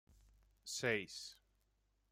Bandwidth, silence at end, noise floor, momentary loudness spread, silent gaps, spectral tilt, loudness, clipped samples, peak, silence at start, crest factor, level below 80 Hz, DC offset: 16 kHz; 0.8 s; -80 dBFS; 16 LU; none; -3 dB/octave; -41 LUFS; under 0.1%; -24 dBFS; 0.65 s; 24 dB; -74 dBFS; under 0.1%